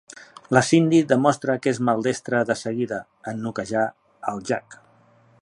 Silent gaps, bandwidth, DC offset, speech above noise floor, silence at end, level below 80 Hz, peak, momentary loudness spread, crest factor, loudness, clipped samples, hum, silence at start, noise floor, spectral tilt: none; 11 kHz; under 0.1%; 35 dB; 0.65 s; -64 dBFS; -2 dBFS; 14 LU; 20 dB; -22 LUFS; under 0.1%; none; 0.15 s; -56 dBFS; -5.5 dB/octave